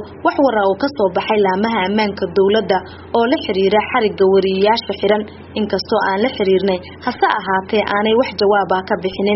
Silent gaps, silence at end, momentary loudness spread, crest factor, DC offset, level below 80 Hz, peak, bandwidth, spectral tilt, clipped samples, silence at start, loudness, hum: none; 0 s; 6 LU; 16 dB; under 0.1%; -50 dBFS; 0 dBFS; 6 kHz; -3.5 dB/octave; under 0.1%; 0 s; -16 LUFS; none